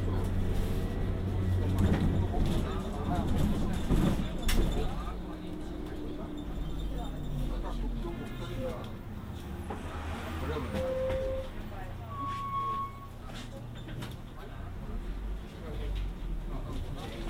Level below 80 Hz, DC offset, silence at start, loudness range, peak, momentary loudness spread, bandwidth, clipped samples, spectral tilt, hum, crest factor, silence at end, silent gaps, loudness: -36 dBFS; under 0.1%; 0 s; 10 LU; -14 dBFS; 12 LU; 16 kHz; under 0.1%; -7 dB/octave; none; 18 dB; 0 s; none; -35 LUFS